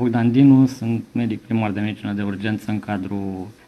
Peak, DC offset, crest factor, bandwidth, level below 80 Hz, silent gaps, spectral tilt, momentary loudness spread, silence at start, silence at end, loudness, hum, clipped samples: -4 dBFS; under 0.1%; 16 dB; 9.4 kHz; -56 dBFS; none; -8 dB/octave; 12 LU; 0 s; 0.15 s; -20 LUFS; none; under 0.1%